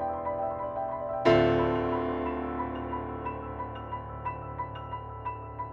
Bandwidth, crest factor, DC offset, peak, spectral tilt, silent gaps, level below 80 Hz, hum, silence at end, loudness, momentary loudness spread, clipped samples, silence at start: 7.2 kHz; 22 dB; under 0.1%; -10 dBFS; -8 dB/octave; none; -48 dBFS; none; 0 s; -31 LUFS; 14 LU; under 0.1%; 0 s